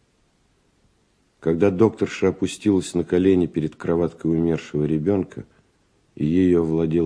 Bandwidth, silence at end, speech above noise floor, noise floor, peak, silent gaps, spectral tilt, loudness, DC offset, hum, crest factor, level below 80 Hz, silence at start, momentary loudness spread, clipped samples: 11 kHz; 0 s; 43 dB; -63 dBFS; -4 dBFS; none; -7.5 dB/octave; -21 LUFS; under 0.1%; none; 18 dB; -48 dBFS; 1.45 s; 7 LU; under 0.1%